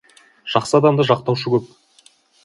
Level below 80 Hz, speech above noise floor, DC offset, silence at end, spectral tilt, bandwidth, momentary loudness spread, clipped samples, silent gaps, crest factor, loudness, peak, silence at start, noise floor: -60 dBFS; 37 dB; under 0.1%; 0.8 s; -6 dB/octave; 11.5 kHz; 7 LU; under 0.1%; none; 20 dB; -18 LUFS; 0 dBFS; 0.45 s; -54 dBFS